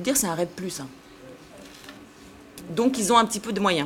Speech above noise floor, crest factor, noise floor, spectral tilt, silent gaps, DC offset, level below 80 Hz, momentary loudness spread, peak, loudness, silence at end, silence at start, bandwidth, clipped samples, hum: 24 dB; 24 dB; -47 dBFS; -3.5 dB/octave; none; under 0.1%; -58 dBFS; 26 LU; -2 dBFS; -24 LUFS; 0 s; 0 s; 17.5 kHz; under 0.1%; none